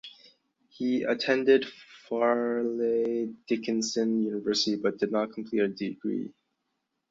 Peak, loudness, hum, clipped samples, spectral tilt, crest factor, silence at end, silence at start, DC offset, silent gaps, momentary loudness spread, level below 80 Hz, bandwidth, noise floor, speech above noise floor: -10 dBFS; -28 LUFS; none; under 0.1%; -4 dB/octave; 18 dB; 0.8 s; 0.05 s; under 0.1%; none; 9 LU; -74 dBFS; 7.8 kHz; -80 dBFS; 53 dB